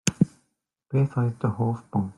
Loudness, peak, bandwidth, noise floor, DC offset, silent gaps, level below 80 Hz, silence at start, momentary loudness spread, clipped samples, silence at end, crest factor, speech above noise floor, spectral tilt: -26 LUFS; 0 dBFS; 12 kHz; -75 dBFS; under 0.1%; none; -58 dBFS; 0.05 s; 4 LU; under 0.1%; 0.05 s; 26 dB; 50 dB; -6.5 dB/octave